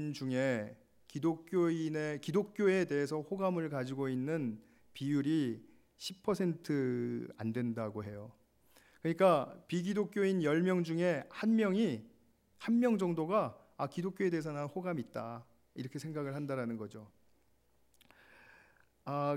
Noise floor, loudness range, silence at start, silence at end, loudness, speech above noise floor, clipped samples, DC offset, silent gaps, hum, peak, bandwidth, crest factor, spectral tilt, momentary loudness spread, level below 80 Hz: -73 dBFS; 9 LU; 0 s; 0 s; -35 LUFS; 38 dB; under 0.1%; under 0.1%; none; none; -16 dBFS; 16 kHz; 20 dB; -7 dB/octave; 14 LU; -78 dBFS